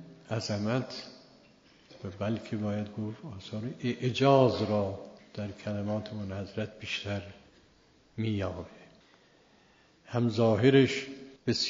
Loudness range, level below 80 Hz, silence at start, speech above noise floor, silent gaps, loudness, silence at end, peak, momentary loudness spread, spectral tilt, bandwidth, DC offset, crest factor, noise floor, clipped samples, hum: 8 LU; -66 dBFS; 0 s; 33 dB; none; -30 LUFS; 0 s; -8 dBFS; 20 LU; -5.5 dB/octave; 7.4 kHz; under 0.1%; 22 dB; -63 dBFS; under 0.1%; none